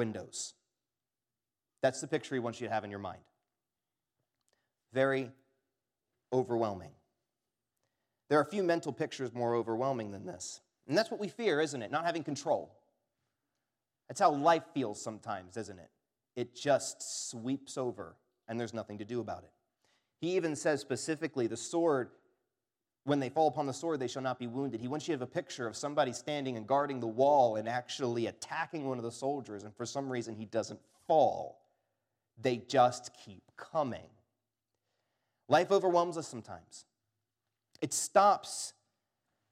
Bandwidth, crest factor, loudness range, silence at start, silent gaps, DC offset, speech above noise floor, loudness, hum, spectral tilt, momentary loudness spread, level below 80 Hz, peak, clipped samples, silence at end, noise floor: 15.5 kHz; 22 dB; 6 LU; 0 s; none; under 0.1%; over 57 dB; -34 LUFS; none; -4.5 dB/octave; 16 LU; -84 dBFS; -12 dBFS; under 0.1%; 0.8 s; under -90 dBFS